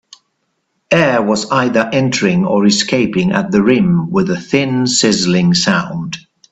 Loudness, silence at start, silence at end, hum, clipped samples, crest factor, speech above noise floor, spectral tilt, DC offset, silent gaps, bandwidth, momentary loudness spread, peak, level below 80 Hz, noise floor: -13 LUFS; 0.9 s; 0.3 s; none; under 0.1%; 14 dB; 54 dB; -4.5 dB/octave; under 0.1%; none; 8.4 kHz; 4 LU; 0 dBFS; -48 dBFS; -67 dBFS